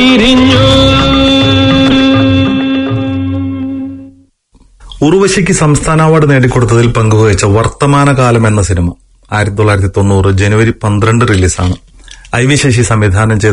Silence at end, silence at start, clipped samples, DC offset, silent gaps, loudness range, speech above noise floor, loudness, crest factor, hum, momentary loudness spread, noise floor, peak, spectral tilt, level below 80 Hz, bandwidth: 0 s; 0 s; 0.6%; under 0.1%; none; 4 LU; 38 dB; -8 LUFS; 8 dB; none; 9 LU; -46 dBFS; 0 dBFS; -5.5 dB/octave; -26 dBFS; 11 kHz